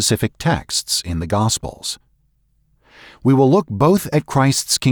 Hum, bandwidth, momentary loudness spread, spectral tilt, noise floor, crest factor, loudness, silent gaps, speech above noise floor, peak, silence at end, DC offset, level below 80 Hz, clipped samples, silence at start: none; over 20 kHz; 9 LU; -4.5 dB/octave; -61 dBFS; 14 dB; -17 LUFS; none; 44 dB; -4 dBFS; 0 s; under 0.1%; -42 dBFS; under 0.1%; 0 s